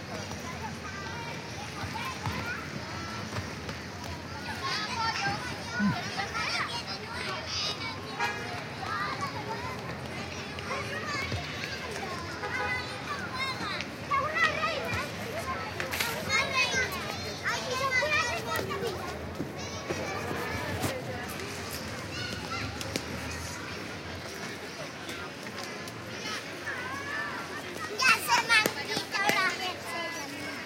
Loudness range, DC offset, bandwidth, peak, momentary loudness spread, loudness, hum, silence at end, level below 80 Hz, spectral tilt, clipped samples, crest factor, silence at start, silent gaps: 8 LU; under 0.1%; 17 kHz; -4 dBFS; 12 LU; -32 LUFS; none; 0 s; -54 dBFS; -3 dB/octave; under 0.1%; 28 dB; 0 s; none